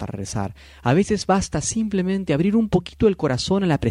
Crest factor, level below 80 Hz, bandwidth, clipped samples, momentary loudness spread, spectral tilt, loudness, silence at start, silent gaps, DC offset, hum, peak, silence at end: 18 dB; -42 dBFS; 11.5 kHz; under 0.1%; 9 LU; -5.5 dB/octave; -21 LUFS; 0 s; none; under 0.1%; none; -4 dBFS; 0 s